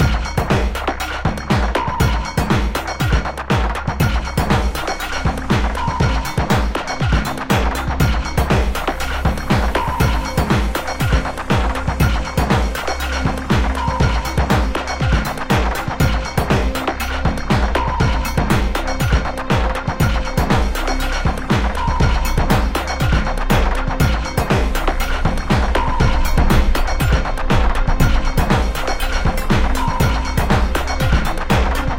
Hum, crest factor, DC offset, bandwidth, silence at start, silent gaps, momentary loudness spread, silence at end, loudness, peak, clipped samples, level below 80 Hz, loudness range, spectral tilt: none; 16 dB; 0.7%; 17 kHz; 0 s; none; 4 LU; 0 s; -18 LUFS; -2 dBFS; under 0.1%; -20 dBFS; 1 LU; -5.5 dB/octave